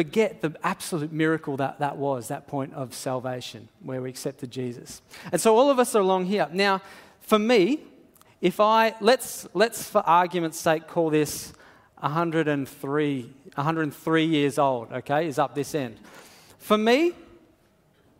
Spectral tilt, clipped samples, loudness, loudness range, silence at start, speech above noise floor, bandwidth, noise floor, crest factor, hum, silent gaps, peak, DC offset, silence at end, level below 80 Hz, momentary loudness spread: -5 dB/octave; under 0.1%; -25 LUFS; 7 LU; 0 s; 37 dB; 16 kHz; -62 dBFS; 20 dB; none; none; -4 dBFS; under 0.1%; 1 s; -66 dBFS; 14 LU